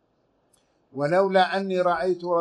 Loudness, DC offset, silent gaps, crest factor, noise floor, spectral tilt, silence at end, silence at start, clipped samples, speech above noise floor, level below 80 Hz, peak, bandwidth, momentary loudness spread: -23 LUFS; under 0.1%; none; 18 dB; -68 dBFS; -6.5 dB/octave; 0 s; 0.95 s; under 0.1%; 45 dB; -66 dBFS; -8 dBFS; 10 kHz; 8 LU